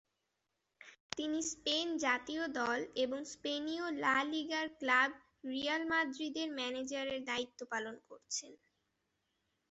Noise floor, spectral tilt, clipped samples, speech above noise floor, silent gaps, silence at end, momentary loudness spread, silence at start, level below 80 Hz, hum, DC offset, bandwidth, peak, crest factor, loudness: -86 dBFS; 0.5 dB/octave; under 0.1%; 48 dB; 1.00-1.10 s; 1.15 s; 9 LU; 0.8 s; -76 dBFS; none; under 0.1%; 8 kHz; -14 dBFS; 24 dB; -37 LUFS